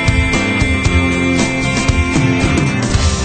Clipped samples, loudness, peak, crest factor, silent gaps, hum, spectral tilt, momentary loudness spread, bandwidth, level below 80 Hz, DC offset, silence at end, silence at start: under 0.1%; -14 LUFS; 0 dBFS; 12 dB; none; none; -5 dB/octave; 1 LU; 9.2 kHz; -20 dBFS; under 0.1%; 0 s; 0 s